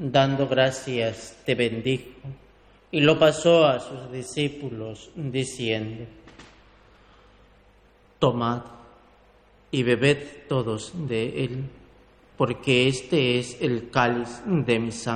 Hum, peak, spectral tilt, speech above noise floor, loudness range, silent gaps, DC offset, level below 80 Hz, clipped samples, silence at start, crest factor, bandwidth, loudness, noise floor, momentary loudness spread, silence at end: 50 Hz at -55 dBFS; -6 dBFS; -5.5 dB/octave; 33 dB; 9 LU; none; under 0.1%; -56 dBFS; under 0.1%; 0 s; 20 dB; 12.5 kHz; -24 LUFS; -57 dBFS; 16 LU; 0 s